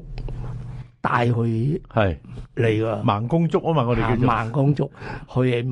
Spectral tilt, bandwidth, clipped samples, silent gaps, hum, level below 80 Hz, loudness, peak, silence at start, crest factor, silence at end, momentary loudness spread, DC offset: -8.5 dB/octave; 9.2 kHz; under 0.1%; none; none; -38 dBFS; -22 LUFS; -6 dBFS; 0 s; 16 dB; 0 s; 14 LU; under 0.1%